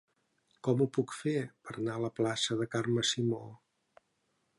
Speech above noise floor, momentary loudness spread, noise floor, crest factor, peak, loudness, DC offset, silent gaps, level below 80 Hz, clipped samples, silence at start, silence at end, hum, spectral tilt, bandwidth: 45 dB; 8 LU; -78 dBFS; 18 dB; -18 dBFS; -33 LUFS; under 0.1%; none; -74 dBFS; under 0.1%; 0.65 s; 1.05 s; none; -5 dB/octave; 11.5 kHz